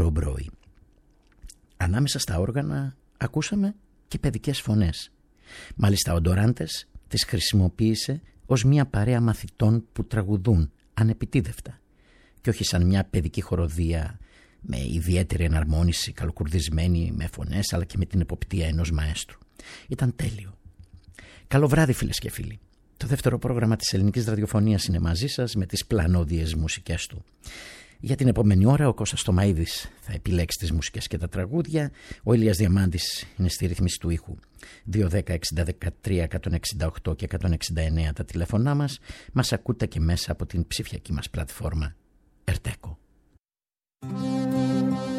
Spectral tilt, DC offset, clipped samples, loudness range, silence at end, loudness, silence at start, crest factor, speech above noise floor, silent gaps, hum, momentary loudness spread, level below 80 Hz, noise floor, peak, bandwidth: -5.5 dB/octave; under 0.1%; under 0.1%; 5 LU; 0 s; -25 LUFS; 0 s; 18 dB; over 66 dB; 43.40-43.44 s; none; 13 LU; -36 dBFS; under -90 dBFS; -6 dBFS; 15.5 kHz